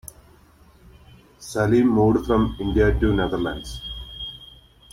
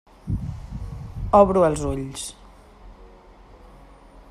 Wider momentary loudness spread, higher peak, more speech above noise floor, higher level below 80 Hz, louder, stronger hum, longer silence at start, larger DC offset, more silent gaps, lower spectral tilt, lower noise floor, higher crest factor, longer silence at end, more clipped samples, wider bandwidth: second, 16 LU vs 19 LU; second, -6 dBFS vs -2 dBFS; first, 33 dB vs 29 dB; about the same, -34 dBFS vs -38 dBFS; about the same, -21 LUFS vs -22 LUFS; neither; second, 0.05 s vs 0.25 s; neither; neither; about the same, -6.5 dB/octave vs -6.5 dB/octave; first, -52 dBFS vs -48 dBFS; second, 16 dB vs 22 dB; first, 0.45 s vs 0.1 s; neither; first, 16 kHz vs 13 kHz